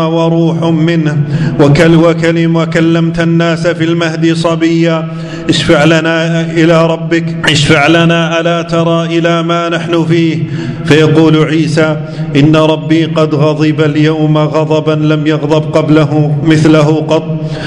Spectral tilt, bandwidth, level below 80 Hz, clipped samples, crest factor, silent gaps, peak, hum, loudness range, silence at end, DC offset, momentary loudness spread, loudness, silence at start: -6.5 dB/octave; 10.5 kHz; -40 dBFS; 2%; 8 dB; none; 0 dBFS; none; 1 LU; 0 s; under 0.1%; 6 LU; -9 LUFS; 0 s